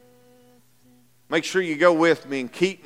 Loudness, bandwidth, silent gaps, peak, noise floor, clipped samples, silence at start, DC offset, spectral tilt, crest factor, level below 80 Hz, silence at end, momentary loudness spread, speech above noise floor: -21 LUFS; 15.5 kHz; none; -2 dBFS; -58 dBFS; under 0.1%; 1.3 s; under 0.1%; -4.5 dB/octave; 22 dB; -76 dBFS; 0.1 s; 9 LU; 37 dB